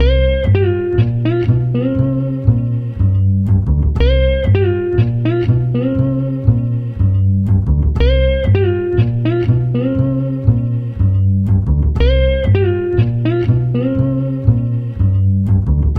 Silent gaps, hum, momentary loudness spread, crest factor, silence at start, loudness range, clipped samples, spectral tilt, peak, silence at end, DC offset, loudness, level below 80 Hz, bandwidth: none; none; 3 LU; 14 dB; 0 s; 1 LU; under 0.1%; -10.5 dB/octave; 0 dBFS; 0 s; under 0.1%; -15 LUFS; -20 dBFS; 5 kHz